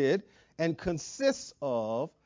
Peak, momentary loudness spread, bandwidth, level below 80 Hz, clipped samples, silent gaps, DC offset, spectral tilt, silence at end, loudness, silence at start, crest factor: -14 dBFS; 5 LU; 7.6 kHz; -60 dBFS; under 0.1%; none; under 0.1%; -5 dB/octave; 0.15 s; -32 LUFS; 0 s; 18 dB